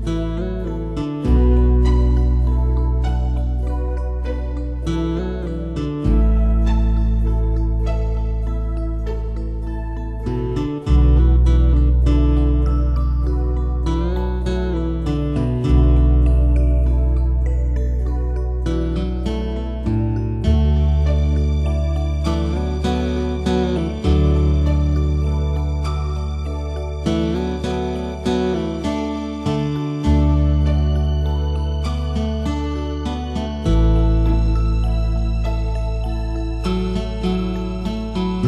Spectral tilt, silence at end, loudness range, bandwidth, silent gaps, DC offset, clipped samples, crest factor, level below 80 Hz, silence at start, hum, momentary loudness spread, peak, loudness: -8.5 dB/octave; 0 s; 4 LU; 7.2 kHz; none; under 0.1%; under 0.1%; 14 dB; -18 dBFS; 0 s; none; 9 LU; -4 dBFS; -20 LUFS